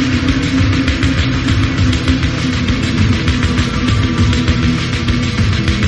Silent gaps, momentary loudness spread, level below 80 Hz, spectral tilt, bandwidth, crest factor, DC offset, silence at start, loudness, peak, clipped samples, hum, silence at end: none; 2 LU; -22 dBFS; -5.5 dB/octave; 11.5 kHz; 12 dB; under 0.1%; 0 s; -14 LUFS; 0 dBFS; under 0.1%; none; 0 s